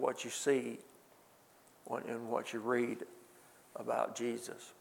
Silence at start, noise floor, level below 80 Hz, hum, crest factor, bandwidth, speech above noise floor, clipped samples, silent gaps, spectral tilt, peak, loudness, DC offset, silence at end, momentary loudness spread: 0 s; -64 dBFS; -90 dBFS; none; 22 dB; 19 kHz; 27 dB; under 0.1%; none; -3.5 dB/octave; -18 dBFS; -38 LUFS; under 0.1%; 0.1 s; 17 LU